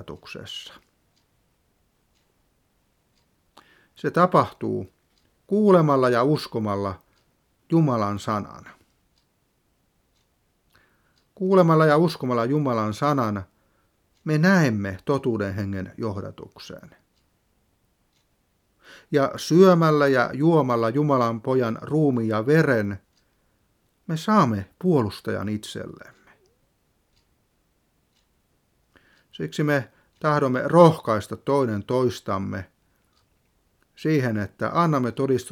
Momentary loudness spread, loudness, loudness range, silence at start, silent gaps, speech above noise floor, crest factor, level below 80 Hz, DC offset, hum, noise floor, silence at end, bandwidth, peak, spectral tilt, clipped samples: 18 LU; -22 LUFS; 12 LU; 0 s; none; 47 dB; 24 dB; -64 dBFS; under 0.1%; none; -69 dBFS; 0 s; 15.5 kHz; 0 dBFS; -7 dB/octave; under 0.1%